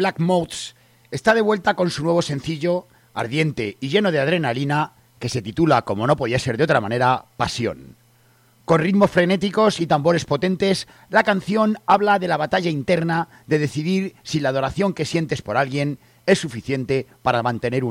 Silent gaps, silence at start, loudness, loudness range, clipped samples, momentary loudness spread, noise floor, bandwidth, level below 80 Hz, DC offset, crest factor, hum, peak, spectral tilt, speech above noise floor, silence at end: none; 0 s; -20 LUFS; 3 LU; under 0.1%; 9 LU; -56 dBFS; 15.5 kHz; -52 dBFS; under 0.1%; 16 dB; none; -4 dBFS; -6 dB/octave; 36 dB; 0 s